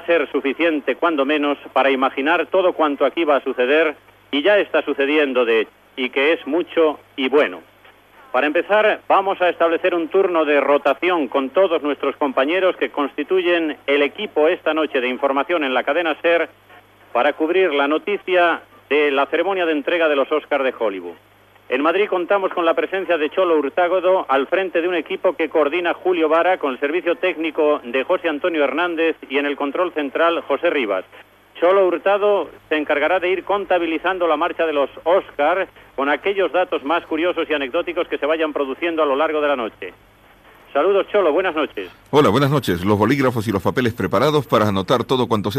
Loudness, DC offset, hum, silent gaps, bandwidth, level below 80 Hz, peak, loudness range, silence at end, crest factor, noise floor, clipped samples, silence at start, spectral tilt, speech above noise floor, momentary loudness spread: -19 LUFS; under 0.1%; none; none; 14.5 kHz; -60 dBFS; -4 dBFS; 2 LU; 0 s; 16 dB; -48 dBFS; under 0.1%; 0 s; -6 dB/octave; 30 dB; 5 LU